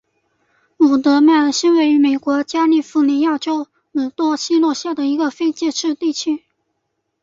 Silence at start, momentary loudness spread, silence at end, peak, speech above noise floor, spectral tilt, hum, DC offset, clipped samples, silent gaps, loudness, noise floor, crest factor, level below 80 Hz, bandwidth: 0.8 s; 10 LU; 0.85 s; -2 dBFS; 57 dB; -2.5 dB/octave; none; under 0.1%; under 0.1%; none; -16 LUFS; -72 dBFS; 14 dB; -64 dBFS; 7.6 kHz